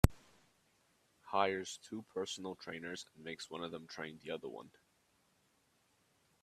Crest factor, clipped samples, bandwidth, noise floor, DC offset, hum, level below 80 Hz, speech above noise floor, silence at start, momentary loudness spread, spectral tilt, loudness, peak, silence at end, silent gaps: 34 dB; under 0.1%; 14.5 kHz; -76 dBFS; under 0.1%; none; -50 dBFS; 33 dB; 0.05 s; 13 LU; -5 dB/octave; -42 LUFS; -8 dBFS; 1.75 s; none